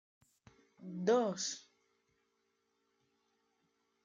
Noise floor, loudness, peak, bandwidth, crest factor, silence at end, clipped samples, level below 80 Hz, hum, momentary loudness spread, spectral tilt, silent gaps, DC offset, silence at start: -81 dBFS; -35 LUFS; -20 dBFS; 9.6 kHz; 20 dB; 2.45 s; under 0.1%; -88 dBFS; none; 17 LU; -4 dB/octave; none; under 0.1%; 0.8 s